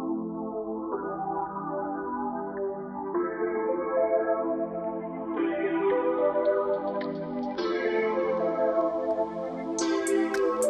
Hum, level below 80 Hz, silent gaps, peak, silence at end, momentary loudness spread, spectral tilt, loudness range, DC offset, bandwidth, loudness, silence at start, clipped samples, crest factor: none; -64 dBFS; none; -14 dBFS; 0 s; 8 LU; -5 dB/octave; 4 LU; under 0.1%; 13 kHz; -29 LUFS; 0 s; under 0.1%; 14 dB